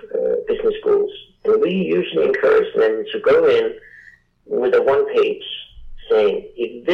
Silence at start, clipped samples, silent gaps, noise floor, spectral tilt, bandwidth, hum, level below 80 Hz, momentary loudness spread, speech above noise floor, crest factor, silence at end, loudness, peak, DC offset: 0.05 s; under 0.1%; none; -48 dBFS; -7 dB/octave; 5.8 kHz; none; -48 dBFS; 11 LU; 31 dB; 8 dB; 0 s; -18 LUFS; -10 dBFS; under 0.1%